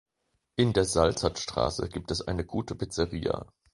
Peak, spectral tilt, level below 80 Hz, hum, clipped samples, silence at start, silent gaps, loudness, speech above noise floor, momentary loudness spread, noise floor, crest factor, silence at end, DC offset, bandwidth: -8 dBFS; -5 dB/octave; -44 dBFS; none; under 0.1%; 0.6 s; none; -29 LUFS; 49 dB; 9 LU; -78 dBFS; 22 dB; 0.3 s; under 0.1%; 11.5 kHz